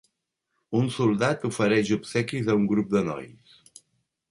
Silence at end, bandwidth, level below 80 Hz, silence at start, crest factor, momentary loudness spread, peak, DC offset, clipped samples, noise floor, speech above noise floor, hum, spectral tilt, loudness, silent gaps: 1 s; 11.5 kHz; -62 dBFS; 0.7 s; 16 dB; 7 LU; -10 dBFS; under 0.1%; under 0.1%; -80 dBFS; 55 dB; none; -6 dB/octave; -25 LUFS; none